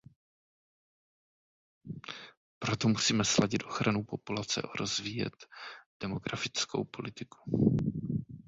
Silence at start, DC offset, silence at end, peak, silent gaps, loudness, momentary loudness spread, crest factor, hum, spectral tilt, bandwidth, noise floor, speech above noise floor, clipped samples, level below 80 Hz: 1.85 s; under 0.1%; 0.05 s; -10 dBFS; 2.37-2.61 s, 5.86-6.00 s; -32 LUFS; 18 LU; 24 dB; none; -4 dB/octave; 8 kHz; under -90 dBFS; over 57 dB; under 0.1%; -60 dBFS